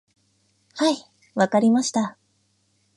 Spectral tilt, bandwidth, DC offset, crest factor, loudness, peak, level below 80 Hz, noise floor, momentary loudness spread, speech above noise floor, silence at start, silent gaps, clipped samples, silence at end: -4.5 dB/octave; 11.5 kHz; under 0.1%; 20 dB; -22 LUFS; -6 dBFS; -74 dBFS; -67 dBFS; 13 LU; 47 dB; 0.75 s; none; under 0.1%; 0.85 s